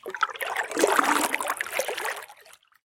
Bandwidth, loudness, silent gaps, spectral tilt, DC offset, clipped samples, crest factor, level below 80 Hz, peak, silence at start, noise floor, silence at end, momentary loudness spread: 17 kHz; -26 LUFS; none; -0.5 dB/octave; under 0.1%; under 0.1%; 22 dB; -72 dBFS; -6 dBFS; 0.05 s; -54 dBFS; 0.45 s; 11 LU